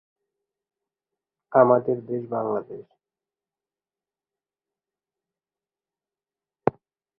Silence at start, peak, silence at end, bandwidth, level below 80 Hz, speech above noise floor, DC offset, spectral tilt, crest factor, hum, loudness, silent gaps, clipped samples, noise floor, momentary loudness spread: 1.5 s; -2 dBFS; 0.5 s; 2.9 kHz; -70 dBFS; over 68 dB; under 0.1%; -12 dB/octave; 28 dB; none; -23 LUFS; none; under 0.1%; under -90 dBFS; 14 LU